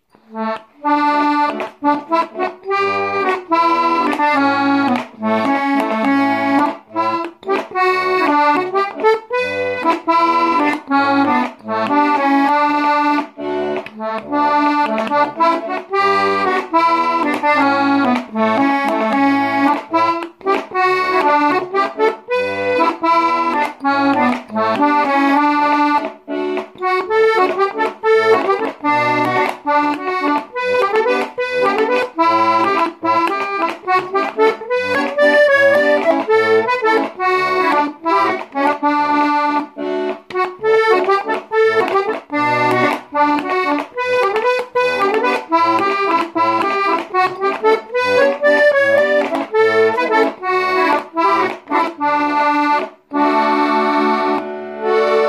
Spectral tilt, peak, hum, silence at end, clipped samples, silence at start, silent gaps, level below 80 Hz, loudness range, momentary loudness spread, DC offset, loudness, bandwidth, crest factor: -5 dB/octave; -2 dBFS; none; 0 s; under 0.1%; 0.3 s; none; -62 dBFS; 2 LU; 6 LU; under 0.1%; -15 LUFS; 14.5 kHz; 14 dB